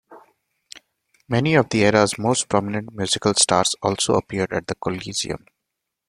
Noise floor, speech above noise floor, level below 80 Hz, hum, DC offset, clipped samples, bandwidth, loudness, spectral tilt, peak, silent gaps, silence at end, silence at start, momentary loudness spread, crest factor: -81 dBFS; 60 dB; -54 dBFS; none; under 0.1%; under 0.1%; 15.5 kHz; -20 LUFS; -3.5 dB/octave; -2 dBFS; none; 0.7 s; 0.1 s; 10 LU; 20 dB